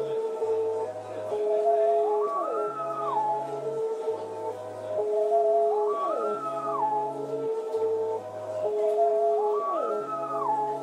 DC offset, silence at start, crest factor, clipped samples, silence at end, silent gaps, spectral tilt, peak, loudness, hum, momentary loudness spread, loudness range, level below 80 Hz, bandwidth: under 0.1%; 0 s; 12 dB; under 0.1%; 0 s; none; -6 dB/octave; -14 dBFS; -28 LUFS; none; 9 LU; 2 LU; -90 dBFS; 10.5 kHz